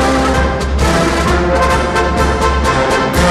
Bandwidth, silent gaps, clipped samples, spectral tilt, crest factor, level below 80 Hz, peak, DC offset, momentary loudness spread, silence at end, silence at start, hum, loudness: 14.5 kHz; none; under 0.1%; -5 dB/octave; 10 dB; -18 dBFS; -2 dBFS; under 0.1%; 2 LU; 0 s; 0 s; none; -13 LUFS